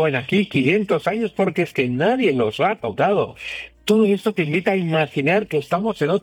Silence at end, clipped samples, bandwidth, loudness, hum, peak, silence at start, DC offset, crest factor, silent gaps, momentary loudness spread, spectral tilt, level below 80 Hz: 0.05 s; under 0.1%; 17.5 kHz; -20 LUFS; none; -4 dBFS; 0 s; under 0.1%; 14 dB; none; 5 LU; -6.5 dB/octave; -58 dBFS